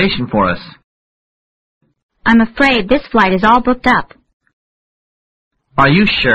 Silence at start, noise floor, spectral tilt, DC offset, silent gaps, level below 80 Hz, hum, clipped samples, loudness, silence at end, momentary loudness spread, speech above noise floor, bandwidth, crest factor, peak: 0 s; under -90 dBFS; -6.5 dB/octave; 0.6%; 0.84-1.81 s, 2.03-2.09 s, 4.33-4.40 s, 4.53-5.51 s; -36 dBFS; none; under 0.1%; -12 LUFS; 0 s; 7 LU; over 78 dB; 8.8 kHz; 14 dB; 0 dBFS